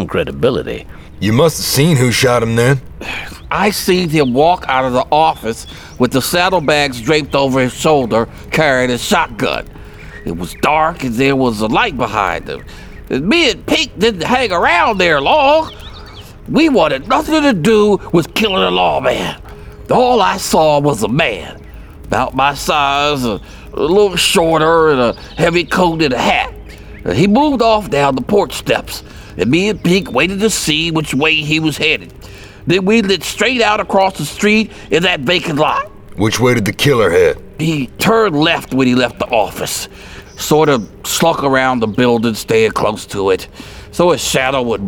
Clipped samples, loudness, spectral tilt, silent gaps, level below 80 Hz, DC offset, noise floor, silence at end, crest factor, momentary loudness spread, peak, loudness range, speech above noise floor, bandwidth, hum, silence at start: under 0.1%; -13 LUFS; -4.5 dB/octave; none; -36 dBFS; 0.2%; -34 dBFS; 0 s; 14 dB; 12 LU; 0 dBFS; 2 LU; 20 dB; over 20 kHz; none; 0 s